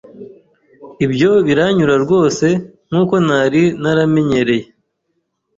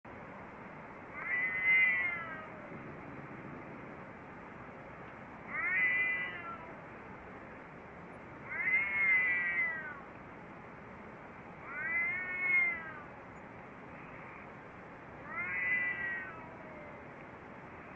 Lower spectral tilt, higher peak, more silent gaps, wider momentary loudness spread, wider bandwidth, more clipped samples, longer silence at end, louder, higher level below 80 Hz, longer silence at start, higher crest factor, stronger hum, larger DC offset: about the same, -6.5 dB/octave vs -6 dB/octave; first, -2 dBFS vs -20 dBFS; neither; second, 7 LU vs 21 LU; about the same, 7.8 kHz vs 7.4 kHz; neither; first, 0.95 s vs 0 s; first, -14 LUFS vs -32 LUFS; first, -50 dBFS vs -68 dBFS; about the same, 0.15 s vs 0.05 s; second, 12 dB vs 18 dB; neither; neither